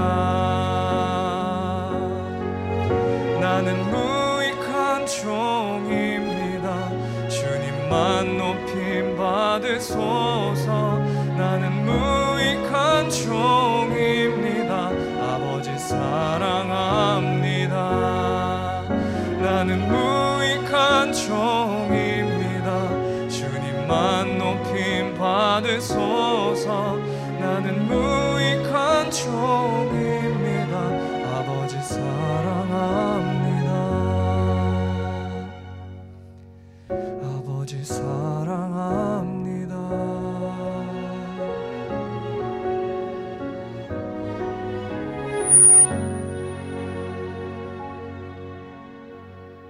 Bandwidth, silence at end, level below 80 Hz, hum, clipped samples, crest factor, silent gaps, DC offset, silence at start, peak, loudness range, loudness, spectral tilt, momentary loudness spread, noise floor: 13.5 kHz; 0 s; -48 dBFS; none; under 0.1%; 20 dB; none; under 0.1%; 0 s; -4 dBFS; 11 LU; -22 LUFS; -4 dB/octave; 11 LU; -45 dBFS